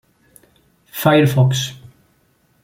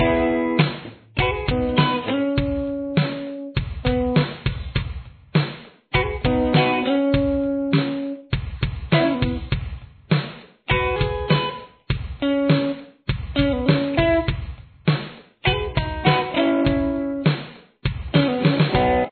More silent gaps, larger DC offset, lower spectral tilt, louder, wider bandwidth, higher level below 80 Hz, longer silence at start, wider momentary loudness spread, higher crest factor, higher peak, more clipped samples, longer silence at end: neither; neither; second, -6 dB/octave vs -10 dB/octave; first, -16 LUFS vs -22 LUFS; first, 17 kHz vs 4.6 kHz; second, -54 dBFS vs -34 dBFS; first, 0.95 s vs 0 s; first, 14 LU vs 10 LU; about the same, 18 dB vs 20 dB; about the same, 0 dBFS vs -2 dBFS; neither; first, 0.9 s vs 0 s